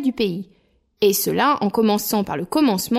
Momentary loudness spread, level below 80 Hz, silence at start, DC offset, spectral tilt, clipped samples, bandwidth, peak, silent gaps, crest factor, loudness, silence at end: 6 LU; -56 dBFS; 0 s; under 0.1%; -4.5 dB/octave; under 0.1%; 16 kHz; -6 dBFS; none; 14 dB; -20 LUFS; 0 s